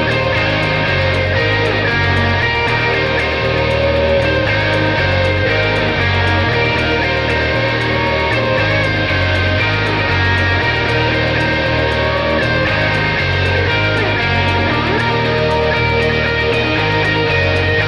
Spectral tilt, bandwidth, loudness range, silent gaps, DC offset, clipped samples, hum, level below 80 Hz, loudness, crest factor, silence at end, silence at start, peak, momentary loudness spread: -6 dB/octave; 10.5 kHz; 0 LU; none; under 0.1%; under 0.1%; none; -30 dBFS; -14 LUFS; 12 dB; 0 s; 0 s; -2 dBFS; 1 LU